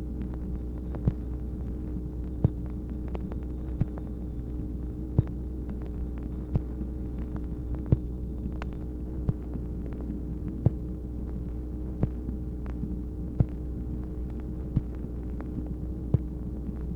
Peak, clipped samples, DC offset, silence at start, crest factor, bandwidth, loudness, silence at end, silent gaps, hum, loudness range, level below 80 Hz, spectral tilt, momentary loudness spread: -8 dBFS; under 0.1%; under 0.1%; 0 s; 22 dB; 3.3 kHz; -34 LUFS; 0 s; none; none; 1 LU; -36 dBFS; -11 dB/octave; 7 LU